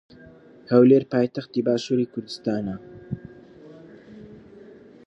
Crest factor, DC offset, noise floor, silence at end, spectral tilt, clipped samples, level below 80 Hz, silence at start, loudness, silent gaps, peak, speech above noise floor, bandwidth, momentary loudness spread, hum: 22 dB; under 0.1%; -48 dBFS; 0.7 s; -7.5 dB/octave; under 0.1%; -60 dBFS; 0.7 s; -22 LUFS; none; -4 dBFS; 27 dB; 8 kHz; 20 LU; none